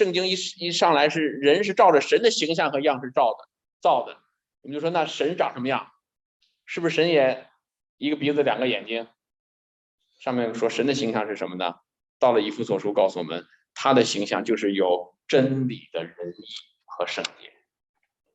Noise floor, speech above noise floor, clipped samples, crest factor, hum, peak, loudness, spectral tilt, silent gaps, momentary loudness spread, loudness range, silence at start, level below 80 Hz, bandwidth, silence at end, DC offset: under -90 dBFS; over 67 dB; under 0.1%; 20 dB; none; -6 dBFS; -23 LUFS; -4.5 dB/octave; 3.73-3.80 s, 6.25-6.40 s, 7.89-7.98 s, 9.39-9.98 s, 12.09-12.20 s; 14 LU; 7 LU; 0 s; -74 dBFS; 8.8 kHz; 1.05 s; under 0.1%